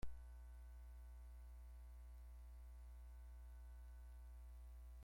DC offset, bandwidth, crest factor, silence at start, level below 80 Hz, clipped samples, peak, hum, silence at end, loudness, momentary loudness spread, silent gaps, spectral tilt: under 0.1%; 16 kHz; 18 dB; 0 s; -58 dBFS; under 0.1%; -36 dBFS; 60 Hz at -60 dBFS; 0 s; -61 LUFS; 0 LU; none; -6 dB/octave